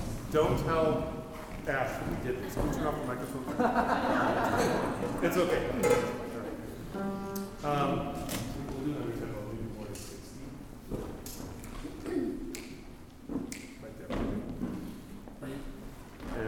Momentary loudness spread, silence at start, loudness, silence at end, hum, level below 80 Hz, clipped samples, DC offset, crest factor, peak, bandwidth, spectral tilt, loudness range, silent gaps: 17 LU; 0 s; -33 LUFS; 0 s; none; -46 dBFS; under 0.1%; under 0.1%; 20 dB; -12 dBFS; 19 kHz; -5.5 dB/octave; 10 LU; none